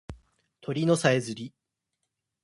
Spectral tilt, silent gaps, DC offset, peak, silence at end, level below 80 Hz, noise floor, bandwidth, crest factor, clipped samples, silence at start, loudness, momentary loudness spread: -5.5 dB/octave; none; under 0.1%; -8 dBFS; 0.95 s; -58 dBFS; -82 dBFS; 11.5 kHz; 22 dB; under 0.1%; 0.1 s; -26 LUFS; 20 LU